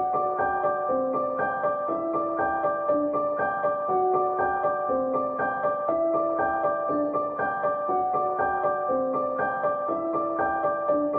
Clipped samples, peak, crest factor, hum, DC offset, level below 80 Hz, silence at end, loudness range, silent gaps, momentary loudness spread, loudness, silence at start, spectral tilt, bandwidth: under 0.1%; -14 dBFS; 12 dB; none; under 0.1%; -60 dBFS; 0 s; 1 LU; none; 2 LU; -26 LUFS; 0 s; -10 dB/octave; 3.7 kHz